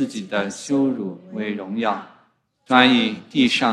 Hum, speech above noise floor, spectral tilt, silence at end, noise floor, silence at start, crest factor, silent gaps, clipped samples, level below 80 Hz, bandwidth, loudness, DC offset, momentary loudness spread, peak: none; 41 dB; -4 dB/octave; 0 s; -61 dBFS; 0 s; 20 dB; none; under 0.1%; -62 dBFS; 11 kHz; -20 LUFS; under 0.1%; 14 LU; 0 dBFS